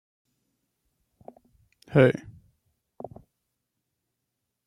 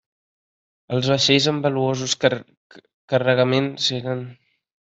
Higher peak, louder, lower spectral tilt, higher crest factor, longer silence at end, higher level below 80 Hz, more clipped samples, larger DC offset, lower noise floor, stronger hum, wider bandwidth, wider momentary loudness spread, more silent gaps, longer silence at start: second, -6 dBFS vs -2 dBFS; second, -23 LUFS vs -20 LUFS; first, -8.5 dB/octave vs -4.5 dB/octave; first, 26 dB vs 20 dB; first, 2.55 s vs 0.5 s; about the same, -64 dBFS vs -62 dBFS; neither; neither; second, -82 dBFS vs under -90 dBFS; neither; first, 10.5 kHz vs 8.2 kHz; first, 24 LU vs 12 LU; second, none vs 2.57-2.70 s, 2.94-3.08 s; first, 1.9 s vs 0.9 s